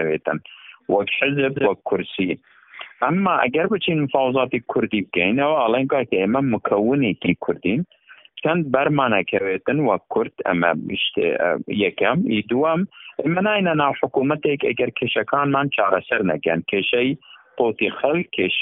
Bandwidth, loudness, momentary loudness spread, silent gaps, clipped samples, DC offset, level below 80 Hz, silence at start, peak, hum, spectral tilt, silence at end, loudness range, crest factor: 4 kHz; -20 LUFS; 6 LU; none; under 0.1%; under 0.1%; -60 dBFS; 0 s; -2 dBFS; none; -4 dB/octave; 0 s; 2 LU; 18 dB